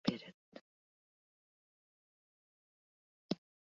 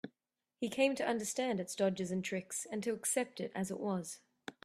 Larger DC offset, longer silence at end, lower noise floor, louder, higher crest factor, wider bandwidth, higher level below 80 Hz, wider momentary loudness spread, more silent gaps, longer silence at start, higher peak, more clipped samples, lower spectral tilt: neither; first, 0.35 s vs 0.15 s; about the same, under -90 dBFS vs -87 dBFS; second, -45 LUFS vs -37 LUFS; first, 30 dB vs 20 dB; second, 7.4 kHz vs 14 kHz; second, -84 dBFS vs -78 dBFS; first, 18 LU vs 10 LU; first, 0.34-0.52 s, 0.61-3.29 s vs none; about the same, 0.05 s vs 0.05 s; about the same, -18 dBFS vs -18 dBFS; neither; about the same, -5 dB/octave vs -4 dB/octave